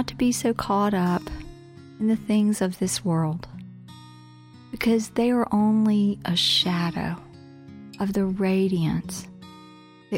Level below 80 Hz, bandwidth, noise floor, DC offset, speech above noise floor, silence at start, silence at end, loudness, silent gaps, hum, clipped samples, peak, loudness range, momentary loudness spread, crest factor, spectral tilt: -50 dBFS; 16.5 kHz; -48 dBFS; under 0.1%; 25 dB; 0 s; 0 s; -23 LUFS; none; none; under 0.1%; -10 dBFS; 4 LU; 23 LU; 16 dB; -5 dB/octave